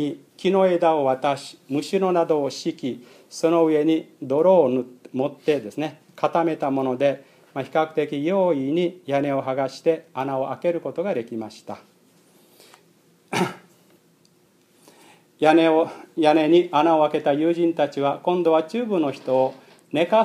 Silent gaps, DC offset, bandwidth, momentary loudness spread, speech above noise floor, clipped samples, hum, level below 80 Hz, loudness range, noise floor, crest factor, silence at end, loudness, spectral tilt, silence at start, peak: none; under 0.1%; 14 kHz; 13 LU; 38 dB; under 0.1%; none; -78 dBFS; 11 LU; -59 dBFS; 20 dB; 0 s; -22 LUFS; -6 dB/octave; 0 s; -2 dBFS